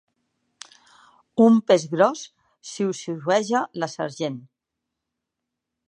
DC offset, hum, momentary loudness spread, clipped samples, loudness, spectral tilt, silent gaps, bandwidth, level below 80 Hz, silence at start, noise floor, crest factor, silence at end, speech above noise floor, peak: under 0.1%; none; 21 LU; under 0.1%; -22 LUFS; -5.5 dB/octave; none; 10 kHz; -76 dBFS; 1.35 s; -83 dBFS; 22 dB; 1.5 s; 62 dB; -4 dBFS